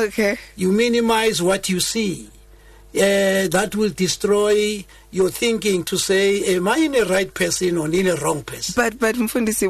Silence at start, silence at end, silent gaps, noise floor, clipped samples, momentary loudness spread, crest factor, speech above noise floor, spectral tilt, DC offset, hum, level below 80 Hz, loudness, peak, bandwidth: 0 s; 0 s; none; -46 dBFS; under 0.1%; 6 LU; 14 dB; 27 dB; -4 dB/octave; under 0.1%; none; -46 dBFS; -19 LUFS; -6 dBFS; 13 kHz